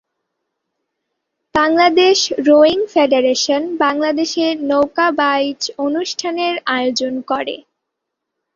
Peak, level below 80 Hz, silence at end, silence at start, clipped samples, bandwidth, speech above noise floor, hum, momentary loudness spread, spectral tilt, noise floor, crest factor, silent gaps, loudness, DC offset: -2 dBFS; -58 dBFS; 0.95 s; 1.55 s; under 0.1%; 7.6 kHz; 63 dB; none; 10 LU; -2.5 dB/octave; -78 dBFS; 16 dB; none; -15 LUFS; under 0.1%